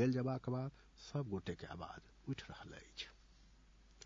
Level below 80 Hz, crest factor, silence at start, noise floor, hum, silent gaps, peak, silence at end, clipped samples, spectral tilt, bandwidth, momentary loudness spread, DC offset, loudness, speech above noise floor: -66 dBFS; 20 dB; 0 s; -65 dBFS; none; none; -24 dBFS; 0 s; under 0.1%; -6.5 dB/octave; 7.4 kHz; 13 LU; under 0.1%; -45 LUFS; 23 dB